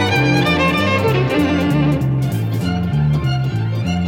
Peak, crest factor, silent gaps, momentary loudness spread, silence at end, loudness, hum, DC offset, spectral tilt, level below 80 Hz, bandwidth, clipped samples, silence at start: -4 dBFS; 12 dB; none; 5 LU; 0 s; -16 LUFS; none; under 0.1%; -6.5 dB/octave; -38 dBFS; 16.5 kHz; under 0.1%; 0 s